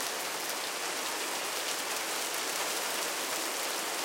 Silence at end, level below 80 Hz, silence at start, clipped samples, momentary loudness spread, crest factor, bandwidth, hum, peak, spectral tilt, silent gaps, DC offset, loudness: 0 s; -84 dBFS; 0 s; under 0.1%; 2 LU; 20 dB; 17 kHz; none; -14 dBFS; 0.5 dB/octave; none; under 0.1%; -32 LUFS